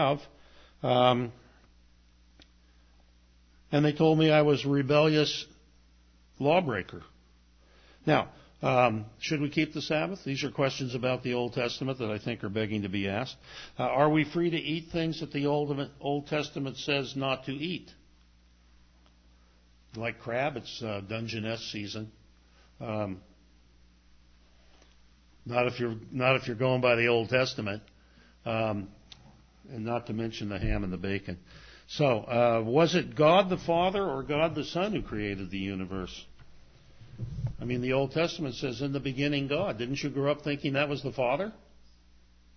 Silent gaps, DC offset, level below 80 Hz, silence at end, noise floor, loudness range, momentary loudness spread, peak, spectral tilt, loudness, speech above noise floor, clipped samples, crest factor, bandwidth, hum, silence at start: none; under 0.1%; -52 dBFS; 1 s; -60 dBFS; 10 LU; 13 LU; -8 dBFS; -6 dB/octave; -29 LUFS; 32 dB; under 0.1%; 22 dB; 6.6 kHz; 60 Hz at -60 dBFS; 0 s